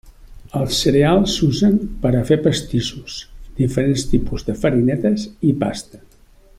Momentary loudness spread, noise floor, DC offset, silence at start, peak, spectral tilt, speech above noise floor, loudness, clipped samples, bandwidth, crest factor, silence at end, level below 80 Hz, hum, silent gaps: 12 LU; -48 dBFS; under 0.1%; 0.05 s; -2 dBFS; -6 dB/octave; 31 dB; -18 LUFS; under 0.1%; 15 kHz; 16 dB; 0.6 s; -34 dBFS; none; none